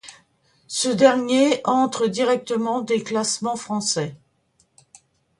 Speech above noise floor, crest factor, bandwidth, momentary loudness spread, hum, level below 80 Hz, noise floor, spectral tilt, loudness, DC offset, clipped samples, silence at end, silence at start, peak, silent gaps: 44 dB; 20 dB; 11.5 kHz; 9 LU; none; -68 dBFS; -65 dBFS; -3.5 dB/octave; -21 LUFS; under 0.1%; under 0.1%; 1.25 s; 0.05 s; -2 dBFS; none